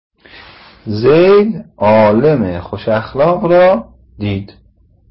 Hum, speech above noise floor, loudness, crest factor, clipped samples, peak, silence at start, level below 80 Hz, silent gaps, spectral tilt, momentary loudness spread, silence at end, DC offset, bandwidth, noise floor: none; 28 dB; -12 LUFS; 12 dB; under 0.1%; -2 dBFS; 0.35 s; -40 dBFS; none; -12 dB/octave; 13 LU; 0.65 s; under 0.1%; 5.8 kHz; -39 dBFS